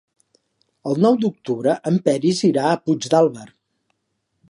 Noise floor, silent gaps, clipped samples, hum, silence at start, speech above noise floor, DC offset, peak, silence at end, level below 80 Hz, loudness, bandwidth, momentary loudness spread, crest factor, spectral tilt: -73 dBFS; none; under 0.1%; none; 0.85 s; 55 dB; under 0.1%; -2 dBFS; 1.05 s; -68 dBFS; -19 LUFS; 11.5 kHz; 7 LU; 18 dB; -6 dB/octave